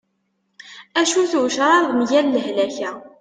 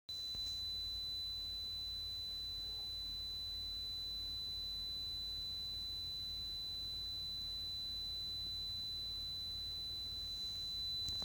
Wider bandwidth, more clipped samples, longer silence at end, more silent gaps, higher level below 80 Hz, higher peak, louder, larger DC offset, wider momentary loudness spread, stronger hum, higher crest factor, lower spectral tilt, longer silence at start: second, 9.6 kHz vs over 20 kHz; neither; about the same, 0.1 s vs 0 s; neither; second, -68 dBFS vs -58 dBFS; first, -4 dBFS vs -28 dBFS; first, -18 LUFS vs -41 LUFS; neither; first, 9 LU vs 2 LU; neither; about the same, 16 dB vs 16 dB; about the same, -2.5 dB/octave vs -2 dB/octave; first, 0.65 s vs 0.1 s